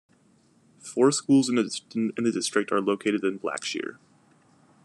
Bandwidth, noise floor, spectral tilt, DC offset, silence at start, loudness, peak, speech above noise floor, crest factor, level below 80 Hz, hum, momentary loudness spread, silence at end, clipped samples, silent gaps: 12 kHz; -62 dBFS; -4 dB/octave; under 0.1%; 0.85 s; -25 LUFS; -8 dBFS; 37 dB; 20 dB; -80 dBFS; none; 12 LU; 0.9 s; under 0.1%; none